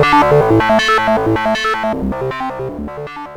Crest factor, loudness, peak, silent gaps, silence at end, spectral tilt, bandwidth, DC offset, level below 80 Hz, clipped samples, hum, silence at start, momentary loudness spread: 14 dB; -14 LUFS; 0 dBFS; none; 0 s; -5.5 dB/octave; 18.5 kHz; under 0.1%; -36 dBFS; under 0.1%; none; 0 s; 14 LU